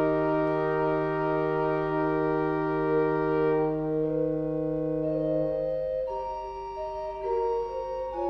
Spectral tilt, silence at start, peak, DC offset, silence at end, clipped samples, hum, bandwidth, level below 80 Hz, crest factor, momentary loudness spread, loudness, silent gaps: -9.5 dB/octave; 0 s; -16 dBFS; under 0.1%; 0 s; under 0.1%; 50 Hz at -50 dBFS; 6 kHz; -50 dBFS; 12 dB; 8 LU; -28 LUFS; none